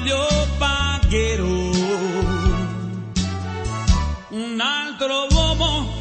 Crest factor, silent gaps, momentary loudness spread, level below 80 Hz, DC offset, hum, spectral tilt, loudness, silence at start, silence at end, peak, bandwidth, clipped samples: 16 dB; none; 8 LU; -24 dBFS; under 0.1%; none; -4.5 dB/octave; -21 LUFS; 0 s; 0 s; -4 dBFS; 8.8 kHz; under 0.1%